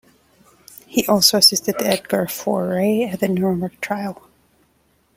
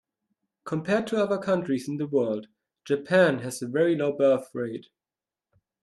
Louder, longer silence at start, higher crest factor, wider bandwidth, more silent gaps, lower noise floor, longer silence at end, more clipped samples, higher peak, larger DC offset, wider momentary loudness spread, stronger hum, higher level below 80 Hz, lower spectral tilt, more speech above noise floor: first, -18 LUFS vs -26 LUFS; first, 0.9 s vs 0.65 s; about the same, 20 dB vs 18 dB; first, 16.5 kHz vs 12.5 kHz; neither; second, -61 dBFS vs under -90 dBFS; about the same, 1.05 s vs 1 s; neither; first, 0 dBFS vs -10 dBFS; neither; about the same, 13 LU vs 12 LU; neither; first, -58 dBFS vs -72 dBFS; second, -3.5 dB/octave vs -6 dB/octave; second, 43 dB vs over 65 dB